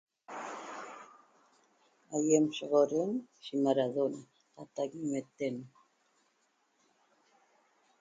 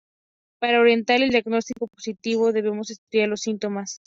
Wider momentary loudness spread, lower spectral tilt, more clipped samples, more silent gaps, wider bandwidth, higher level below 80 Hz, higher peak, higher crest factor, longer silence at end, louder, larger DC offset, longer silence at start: first, 19 LU vs 13 LU; first, -5 dB/octave vs -2.5 dB/octave; neither; second, none vs 2.98-3.07 s; first, 9.6 kHz vs 7.6 kHz; second, -84 dBFS vs -66 dBFS; second, -14 dBFS vs -6 dBFS; first, 22 dB vs 16 dB; first, 2.35 s vs 0.1 s; second, -33 LUFS vs -22 LUFS; neither; second, 0.3 s vs 0.6 s